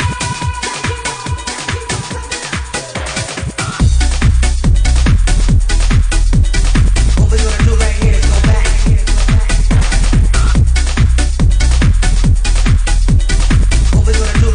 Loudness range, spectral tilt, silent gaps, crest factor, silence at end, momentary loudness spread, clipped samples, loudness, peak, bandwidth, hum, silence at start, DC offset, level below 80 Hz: 5 LU; -4.5 dB/octave; none; 8 dB; 0 s; 7 LU; under 0.1%; -14 LUFS; -2 dBFS; 10.5 kHz; none; 0 s; under 0.1%; -12 dBFS